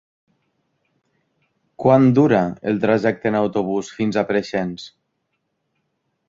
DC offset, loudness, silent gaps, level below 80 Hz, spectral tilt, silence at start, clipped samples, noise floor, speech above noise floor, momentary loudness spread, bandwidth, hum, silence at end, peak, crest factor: under 0.1%; -19 LUFS; none; -56 dBFS; -7.5 dB/octave; 1.8 s; under 0.1%; -73 dBFS; 55 dB; 11 LU; 7.6 kHz; none; 1.4 s; -2 dBFS; 18 dB